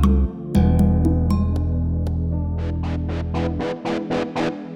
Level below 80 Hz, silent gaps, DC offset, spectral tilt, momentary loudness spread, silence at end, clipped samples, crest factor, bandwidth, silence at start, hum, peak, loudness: -26 dBFS; none; under 0.1%; -8.5 dB/octave; 8 LU; 0 s; under 0.1%; 16 dB; 11.5 kHz; 0 s; none; -4 dBFS; -22 LUFS